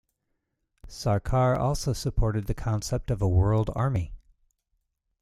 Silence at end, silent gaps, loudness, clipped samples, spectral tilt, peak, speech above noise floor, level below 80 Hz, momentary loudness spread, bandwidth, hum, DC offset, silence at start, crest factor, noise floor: 1.05 s; none; -27 LUFS; under 0.1%; -6.5 dB/octave; -12 dBFS; 53 dB; -38 dBFS; 8 LU; 14 kHz; none; under 0.1%; 0.85 s; 16 dB; -78 dBFS